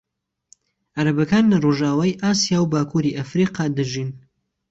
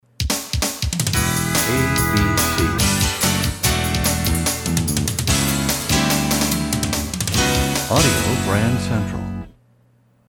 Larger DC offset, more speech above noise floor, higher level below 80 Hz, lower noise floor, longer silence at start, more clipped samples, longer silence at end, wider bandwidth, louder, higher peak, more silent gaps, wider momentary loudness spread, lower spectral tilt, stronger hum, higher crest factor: neither; about the same, 38 dB vs 39 dB; second, -56 dBFS vs -30 dBFS; about the same, -57 dBFS vs -57 dBFS; first, 0.95 s vs 0.2 s; neither; second, 0.5 s vs 0.75 s; second, 8 kHz vs 20 kHz; about the same, -20 LUFS vs -18 LUFS; about the same, -6 dBFS vs -4 dBFS; neither; first, 8 LU vs 5 LU; first, -5.5 dB/octave vs -3.5 dB/octave; neither; about the same, 14 dB vs 16 dB